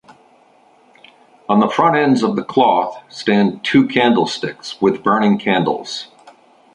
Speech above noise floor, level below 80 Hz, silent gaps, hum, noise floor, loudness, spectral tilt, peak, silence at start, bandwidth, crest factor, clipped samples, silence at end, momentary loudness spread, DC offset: 36 dB; -58 dBFS; none; none; -51 dBFS; -16 LUFS; -6 dB/octave; 0 dBFS; 1.5 s; 10 kHz; 16 dB; under 0.1%; 0.7 s; 12 LU; under 0.1%